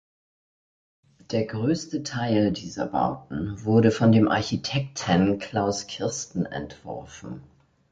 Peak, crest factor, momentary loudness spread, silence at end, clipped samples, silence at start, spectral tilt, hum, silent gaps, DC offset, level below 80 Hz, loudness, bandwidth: -6 dBFS; 20 dB; 18 LU; 0.5 s; under 0.1%; 1.3 s; -6 dB/octave; none; none; under 0.1%; -52 dBFS; -25 LUFS; 9.2 kHz